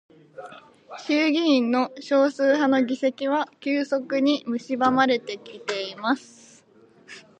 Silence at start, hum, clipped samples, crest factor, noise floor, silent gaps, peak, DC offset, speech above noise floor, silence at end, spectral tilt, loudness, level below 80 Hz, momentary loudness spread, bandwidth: 0.4 s; none; under 0.1%; 18 dB; -55 dBFS; none; -6 dBFS; under 0.1%; 32 dB; 0.2 s; -4 dB/octave; -23 LUFS; -78 dBFS; 16 LU; 9 kHz